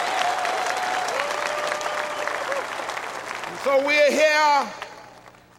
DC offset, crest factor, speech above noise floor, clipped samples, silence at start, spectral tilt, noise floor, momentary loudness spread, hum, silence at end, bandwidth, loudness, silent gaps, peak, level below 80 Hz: under 0.1%; 16 dB; 29 dB; under 0.1%; 0 s; -1.5 dB/octave; -48 dBFS; 14 LU; none; 0.3 s; 16 kHz; -23 LUFS; none; -8 dBFS; -66 dBFS